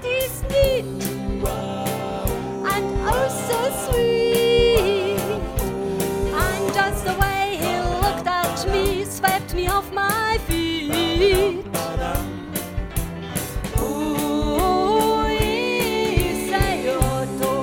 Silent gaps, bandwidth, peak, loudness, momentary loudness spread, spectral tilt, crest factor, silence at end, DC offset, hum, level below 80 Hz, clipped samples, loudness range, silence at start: none; 17.5 kHz; -2 dBFS; -22 LUFS; 8 LU; -4.5 dB/octave; 18 dB; 0 s; under 0.1%; none; -32 dBFS; under 0.1%; 3 LU; 0 s